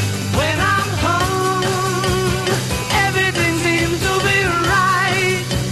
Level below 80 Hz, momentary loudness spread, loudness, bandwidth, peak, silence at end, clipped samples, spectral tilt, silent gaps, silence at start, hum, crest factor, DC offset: -34 dBFS; 3 LU; -17 LUFS; 13 kHz; -4 dBFS; 0 s; under 0.1%; -4 dB/octave; none; 0 s; none; 14 dB; under 0.1%